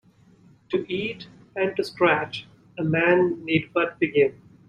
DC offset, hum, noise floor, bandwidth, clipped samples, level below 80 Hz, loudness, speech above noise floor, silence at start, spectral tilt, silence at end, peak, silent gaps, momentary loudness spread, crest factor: under 0.1%; none; -55 dBFS; 10.5 kHz; under 0.1%; -62 dBFS; -24 LUFS; 32 dB; 0.7 s; -7 dB/octave; 0.35 s; -4 dBFS; none; 14 LU; 20 dB